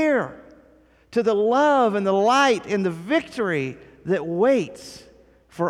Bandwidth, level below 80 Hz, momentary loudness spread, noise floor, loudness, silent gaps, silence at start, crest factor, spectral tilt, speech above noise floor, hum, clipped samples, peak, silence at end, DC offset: 13.5 kHz; -60 dBFS; 15 LU; -55 dBFS; -21 LUFS; none; 0 s; 16 dB; -5.5 dB/octave; 34 dB; none; under 0.1%; -6 dBFS; 0 s; under 0.1%